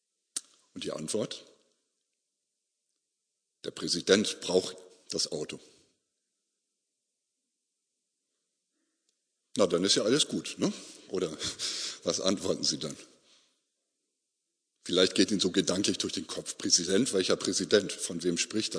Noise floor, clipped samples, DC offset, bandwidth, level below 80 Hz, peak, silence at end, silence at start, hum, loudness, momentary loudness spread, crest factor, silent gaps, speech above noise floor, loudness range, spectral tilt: -84 dBFS; under 0.1%; under 0.1%; 11 kHz; -72 dBFS; -6 dBFS; 0 s; 0.35 s; none; -29 LUFS; 14 LU; 26 dB; none; 54 dB; 12 LU; -3 dB/octave